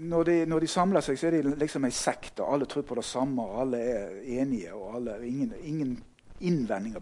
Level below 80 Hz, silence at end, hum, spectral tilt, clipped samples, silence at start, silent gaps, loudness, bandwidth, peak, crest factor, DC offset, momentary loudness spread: -54 dBFS; 0 s; none; -5.5 dB/octave; under 0.1%; 0 s; none; -30 LUFS; 11.5 kHz; -12 dBFS; 18 dB; under 0.1%; 10 LU